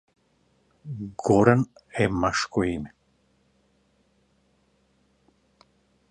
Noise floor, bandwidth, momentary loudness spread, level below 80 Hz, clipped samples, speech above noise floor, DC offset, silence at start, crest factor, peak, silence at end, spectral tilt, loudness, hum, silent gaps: -66 dBFS; 9.8 kHz; 20 LU; -52 dBFS; under 0.1%; 44 dB; under 0.1%; 0.85 s; 26 dB; -2 dBFS; 3.2 s; -6 dB/octave; -24 LUFS; none; none